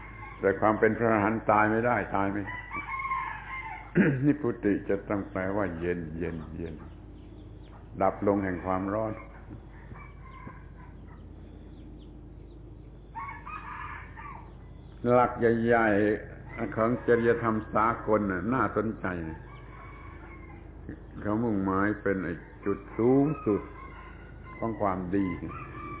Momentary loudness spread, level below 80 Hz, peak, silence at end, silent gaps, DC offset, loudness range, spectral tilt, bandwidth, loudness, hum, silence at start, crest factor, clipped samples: 23 LU; -48 dBFS; -8 dBFS; 0 s; none; under 0.1%; 16 LU; -7 dB/octave; 4 kHz; -28 LUFS; none; 0 s; 22 dB; under 0.1%